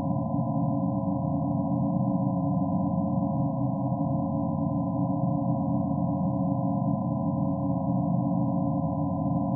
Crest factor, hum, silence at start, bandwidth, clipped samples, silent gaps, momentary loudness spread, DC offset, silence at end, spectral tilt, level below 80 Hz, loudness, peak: 12 dB; none; 0 s; 1.2 kHz; under 0.1%; none; 2 LU; under 0.1%; 0 s; -6 dB/octave; -54 dBFS; -27 LUFS; -14 dBFS